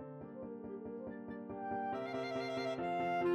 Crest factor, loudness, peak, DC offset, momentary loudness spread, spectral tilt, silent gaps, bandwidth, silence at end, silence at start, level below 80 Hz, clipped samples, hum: 16 dB; -41 LUFS; -24 dBFS; under 0.1%; 10 LU; -6.5 dB/octave; none; 12.5 kHz; 0 s; 0 s; -72 dBFS; under 0.1%; none